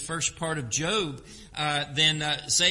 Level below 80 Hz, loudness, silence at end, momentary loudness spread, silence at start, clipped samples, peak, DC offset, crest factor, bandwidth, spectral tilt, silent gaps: -54 dBFS; -26 LUFS; 0 s; 11 LU; 0 s; under 0.1%; -8 dBFS; under 0.1%; 20 dB; 11.5 kHz; -2 dB/octave; none